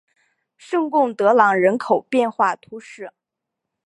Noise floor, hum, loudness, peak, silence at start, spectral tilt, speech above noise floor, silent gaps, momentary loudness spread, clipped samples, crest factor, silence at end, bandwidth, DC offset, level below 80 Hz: -82 dBFS; none; -18 LUFS; -2 dBFS; 0.7 s; -6 dB/octave; 64 dB; none; 22 LU; under 0.1%; 18 dB; 0.75 s; 11.5 kHz; under 0.1%; -76 dBFS